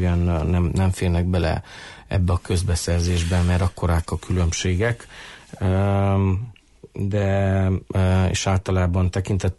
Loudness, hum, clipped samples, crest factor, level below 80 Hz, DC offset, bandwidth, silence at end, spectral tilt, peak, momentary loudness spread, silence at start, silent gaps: -22 LUFS; none; under 0.1%; 10 dB; -34 dBFS; under 0.1%; 11.5 kHz; 0.05 s; -6 dB/octave; -10 dBFS; 9 LU; 0 s; none